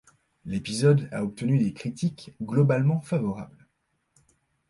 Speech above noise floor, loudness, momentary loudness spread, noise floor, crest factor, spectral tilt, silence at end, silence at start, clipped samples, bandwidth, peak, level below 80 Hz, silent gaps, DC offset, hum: 50 dB; -26 LUFS; 15 LU; -74 dBFS; 18 dB; -7.5 dB/octave; 1.25 s; 0.45 s; under 0.1%; 11.5 kHz; -10 dBFS; -60 dBFS; none; under 0.1%; none